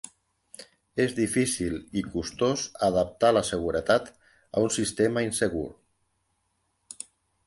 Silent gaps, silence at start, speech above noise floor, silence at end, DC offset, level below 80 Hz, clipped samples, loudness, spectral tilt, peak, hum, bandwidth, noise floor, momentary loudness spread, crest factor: none; 0.05 s; 48 dB; 1.75 s; under 0.1%; -52 dBFS; under 0.1%; -27 LUFS; -4.5 dB/octave; -10 dBFS; none; 12 kHz; -74 dBFS; 20 LU; 18 dB